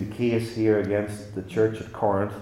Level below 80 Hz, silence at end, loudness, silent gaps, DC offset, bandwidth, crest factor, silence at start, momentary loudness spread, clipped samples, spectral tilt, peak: -58 dBFS; 0 s; -25 LUFS; none; under 0.1%; 14 kHz; 16 dB; 0 s; 8 LU; under 0.1%; -7.5 dB/octave; -8 dBFS